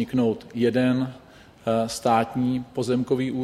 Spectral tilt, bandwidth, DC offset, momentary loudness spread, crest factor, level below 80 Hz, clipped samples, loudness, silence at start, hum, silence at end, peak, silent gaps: -6.5 dB/octave; 14 kHz; under 0.1%; 5 LU; 18 dB; -58 dBFS; under 0.1%; -24 LUFS; 0 s; none; 0 s; -6 dBFS; none